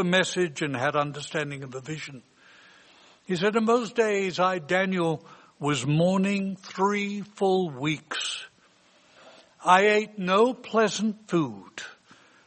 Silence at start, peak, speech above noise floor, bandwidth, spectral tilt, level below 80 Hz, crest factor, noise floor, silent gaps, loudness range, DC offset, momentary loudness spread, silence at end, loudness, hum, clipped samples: 0 s; -4 dBFS; 35 dB; 8.8 kHz; -5 dB/octave; -70 dBFS; 22 dB; -60 dBFS; none; 5 LU; under 0.1%; 14 LU; 0.55 s; -26 LUFS; none; under 0.1%